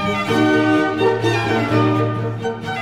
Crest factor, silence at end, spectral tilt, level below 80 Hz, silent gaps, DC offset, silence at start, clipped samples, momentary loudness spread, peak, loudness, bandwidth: 14 dB; 0 s; -6.5 dB/octave; -48 dBFS; none; under 0.1%; 0 s; under 0.1%; 8 LU; -4 dBFS; -18 LUFS; 13 kHz